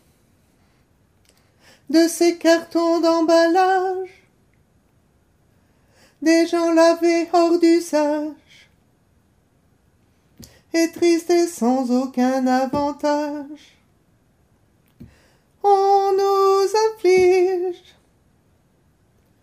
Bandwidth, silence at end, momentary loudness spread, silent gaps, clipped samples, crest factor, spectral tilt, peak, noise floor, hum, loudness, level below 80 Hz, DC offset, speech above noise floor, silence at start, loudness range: 15 kHz; 1.7 s; 10 LU; none; under 0.1%; 16 dB; -3.5 dB/octave; -4 dBFS; -60 dBFS; none; -18 LUFS; -60 dBFS; under 0.1%; 43 dB; 1.9 s; 6 LU